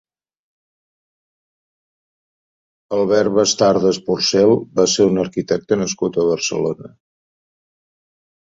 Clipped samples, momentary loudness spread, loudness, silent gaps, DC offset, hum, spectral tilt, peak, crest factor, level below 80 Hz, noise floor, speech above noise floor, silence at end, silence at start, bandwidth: under 0.1%; 7 LU; -17 LUFS; none; under 0.1%; none; -4 dB/octave; -2 dBFS; 18 dB; -56 dBFS; under -90 dBFS; over 74 dB; 1.55 s; 2.9 s; 8 kHz